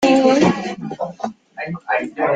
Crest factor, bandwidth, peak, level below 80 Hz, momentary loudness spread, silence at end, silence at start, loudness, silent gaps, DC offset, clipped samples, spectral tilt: 16 dB; 9.2 kHz; -2 dBFS; -56 dBFS; 16 LU; 0 s; 0 s; -19 LUFS; none; under 0.1%; under 0.1%; -5.5 dB/octave